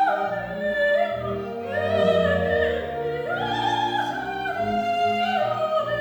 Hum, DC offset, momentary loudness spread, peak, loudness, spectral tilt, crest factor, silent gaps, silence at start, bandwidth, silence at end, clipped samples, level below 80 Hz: none; under 0.1%; 7 LU; -8 dBFS; -24 LUFS; -5.5 dB/octave; 16 dB; none; 0 s; over 20 kHz; 0 s; under 0.1%; -52 dBFS